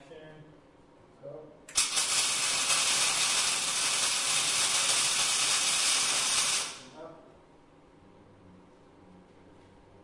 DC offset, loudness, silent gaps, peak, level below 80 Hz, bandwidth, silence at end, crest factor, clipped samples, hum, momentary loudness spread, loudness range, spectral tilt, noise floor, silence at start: under 0.1%; -25 LUFS; none; -12 dBFS; -66 dBFS; 11.5 kHz; 1.55 s; 18 dB; under 0.1%; none; 9 LU; 6 LU; 1.5 dB/octave; -58 dBFS; 0.1 s